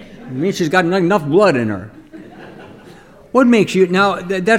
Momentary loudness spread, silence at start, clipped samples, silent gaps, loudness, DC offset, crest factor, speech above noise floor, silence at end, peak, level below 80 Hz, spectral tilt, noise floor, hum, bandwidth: 15 LU; 0 s; under 0.1%; none; -15 LUFS; under 0.1%; 16 dB; 27 dB; 0 s; 0 dBFS; -52 dBFS; -6 dB/octave; -41 dBFS; none; 15.5 kHz